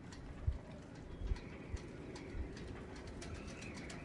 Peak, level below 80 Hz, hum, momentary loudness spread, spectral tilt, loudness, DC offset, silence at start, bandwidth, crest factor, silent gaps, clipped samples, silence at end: -26 dBFS; -50 dBFS; none; 7 LU; -6 dB/octave; -48 LUFS; under 0.1%; 0 s; 11.5 kHz; 20 dB; none; under 0.1%; 0 s